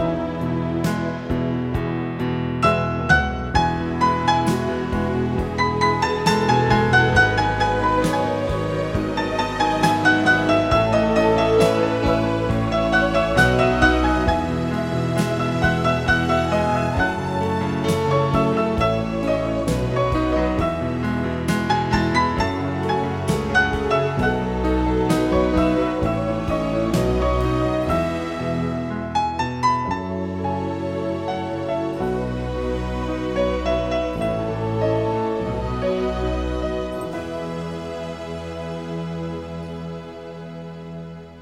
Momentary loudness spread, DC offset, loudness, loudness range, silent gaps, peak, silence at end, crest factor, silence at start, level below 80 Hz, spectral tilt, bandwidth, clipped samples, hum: 11 LU; 0.2%; -21 LUFS; 7 LU; none; -2 dBFS; 0 s; 18 dB; 0 s; -34 dBFS; -6 dB/octave; 16.5 kHz; under 0.1%; none